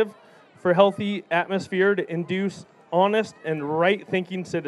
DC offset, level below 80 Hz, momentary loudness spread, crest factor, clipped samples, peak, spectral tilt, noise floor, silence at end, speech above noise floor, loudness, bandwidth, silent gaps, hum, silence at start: under 0.1%; -72 dBFS; 10 LU; 22 dB; under 0.1%; -2 dBFS; -6.5 dB/octave; -52 dBFS; 0 s; 29 dB; -24 LUFS; 11.5 kHz; none; none; 0 s